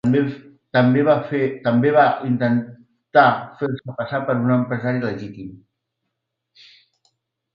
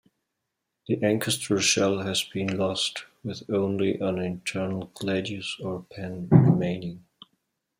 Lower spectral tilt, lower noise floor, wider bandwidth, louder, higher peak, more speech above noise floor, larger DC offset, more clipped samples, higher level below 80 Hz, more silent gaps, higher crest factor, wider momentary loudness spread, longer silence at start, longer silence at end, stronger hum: first, -9 dB/octave vs -5 dB/octave; second, -78 dBFS vs -82 dBFS; second, 5.4 kHz vs 16 kHz; first, -19 LUFS vs -26 LUFS; first, 0 dBFS vs -4 dBFS; first, 60 dB vs 55 dB; neither; neither; about the same, -62 dBFS vs -64 dBFS; neither; about the same, 20 dB vs 24 dB; about the same, 15 LU vs 15 LU; second, 0.05 s vs 0.9 s; first, 2 s vs 0.8 s; neither